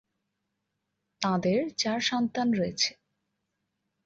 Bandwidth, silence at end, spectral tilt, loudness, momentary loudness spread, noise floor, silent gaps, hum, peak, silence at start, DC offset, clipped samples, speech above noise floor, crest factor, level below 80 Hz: 7.8 kHz; 1.15 s; -4 dB/octave; -28 LUFS; 3 LU; -82 dBFS; none; none; -8 dBFS; 1.2 s; under 0.1%; under 0.1%; 54 dB; 22 dB; -68 dBFS